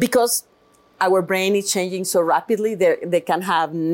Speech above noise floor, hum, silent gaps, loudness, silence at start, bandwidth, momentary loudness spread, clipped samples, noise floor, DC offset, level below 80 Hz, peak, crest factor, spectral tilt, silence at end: 37 dB; none; none; -19 LUFS; 0 s; 17 kHz; 4 LU; under 0.1%; -56 dBFS; under 0.1%; -66 dBFS; -6 dBFS; 12 dB; -3.5 dB/octave; 0 s